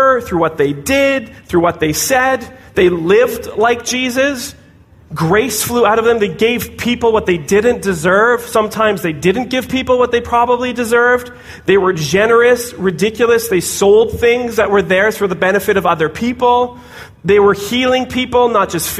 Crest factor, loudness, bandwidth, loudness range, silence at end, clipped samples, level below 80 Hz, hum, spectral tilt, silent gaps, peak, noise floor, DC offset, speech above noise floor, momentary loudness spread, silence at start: 12 dB; -13 LUFS; 15.5 kHz; 2 LU; 0 s; under 0.1%; -40 dBFS; none; -4 dB/octave; none; -2 dBFS; -43 dBFS; under 0.1%; 30 dB; 6 LU; 0 s